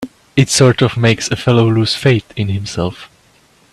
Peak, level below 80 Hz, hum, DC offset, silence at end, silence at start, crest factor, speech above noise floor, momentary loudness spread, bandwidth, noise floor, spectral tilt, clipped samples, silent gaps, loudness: 0 dBFS; -44 dBFS; none; under 0.1%; 0.65 s; 0 s; 14 dB; 38 dB; 10 LU; 13.5 kHz; -51 dBFS; -5 dB/octave; under 0.1%; none; -14 LUFS